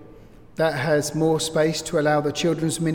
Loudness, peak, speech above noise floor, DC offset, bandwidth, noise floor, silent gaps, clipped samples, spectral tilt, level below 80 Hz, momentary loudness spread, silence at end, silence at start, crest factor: -22 LUFS; -8 dBFS; 25 dB; under 0.1%; 17.5 kHz; -47 dBFS; none; under 0.1%; -5 dB/octave; -50 dBFS; 3 LU; 0 s; 0 s; 14 dB